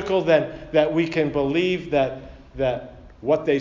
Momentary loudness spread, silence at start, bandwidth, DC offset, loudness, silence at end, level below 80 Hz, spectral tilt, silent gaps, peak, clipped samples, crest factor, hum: 12 LU; 0 s; 7.6 kHz; under 0.1%; -22 LUFS; 0 s; -46 dBFS; -7 dB/octave; none; -4 dBFS; under 0.1%; 18 dB; none